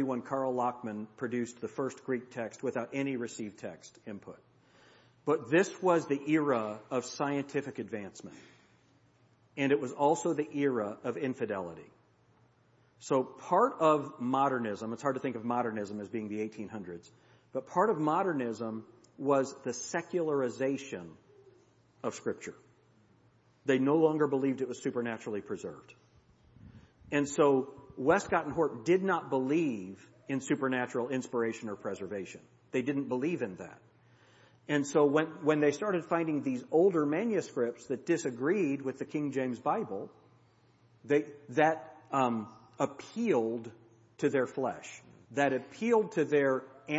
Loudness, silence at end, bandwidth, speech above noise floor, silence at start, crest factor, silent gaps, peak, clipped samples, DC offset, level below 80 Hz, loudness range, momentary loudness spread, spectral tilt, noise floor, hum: -32 LUFS; 0 s; 8 kHz; 35 dB; 0 s; 20 dB; none; -12 dBFS; under 0.1%; under 0.1%; -74 dBFS; 6 LU; 15 LU; -6 dB/octave; -67 dBFS; none